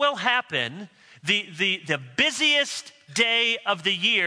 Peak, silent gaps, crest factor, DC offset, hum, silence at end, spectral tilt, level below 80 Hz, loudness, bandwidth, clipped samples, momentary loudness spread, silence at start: -6 dBFS; none; 20 dB; under 0.1%; none; 0 s; -2 dB/octave; -72 dBFS; -22 LUFS; 11 kHz; under 0.1%; 11 LU; 0 s